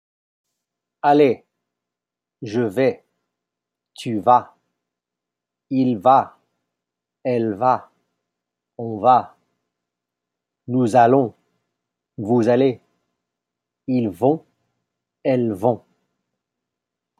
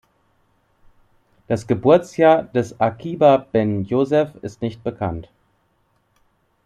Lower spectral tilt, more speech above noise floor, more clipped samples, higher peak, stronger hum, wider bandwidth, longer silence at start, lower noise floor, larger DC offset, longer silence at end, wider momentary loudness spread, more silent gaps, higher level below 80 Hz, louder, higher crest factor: about the same, -7.5 dB/octave vs -7.5 dB/octave; first, 69 dB vs 46 dB; neither; about the same, -2 dBFS vs -2 dBFS; first, 60 Hz at -55 dBFS vs none; first, 12.5 kHz vs 10.5 kHz; second, 1.05 s vs 1.5 s; first, -87 dBFS vs -64 dBFS; neither; about the same, 1.4 s vs 1.45 s; first, 16 LU vs 12 LU; neither; second, -72 dBFS vs -54 dBFS; about the same, -19 LUFS vs -19 LUFS; about the same, 20 dB vs 18 dB